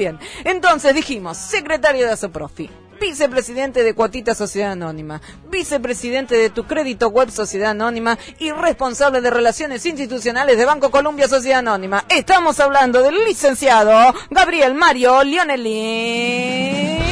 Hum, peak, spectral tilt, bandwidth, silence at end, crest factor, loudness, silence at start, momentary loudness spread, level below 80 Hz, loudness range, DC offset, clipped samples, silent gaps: none; -2 dBFS; -3.5 dB/octave; 11 kHz; 0 s; 14 dB; -16 LUFS; 0 s; 11 LU; -42 dBFS; 7 LU; under 0.1%; under 0.1%; none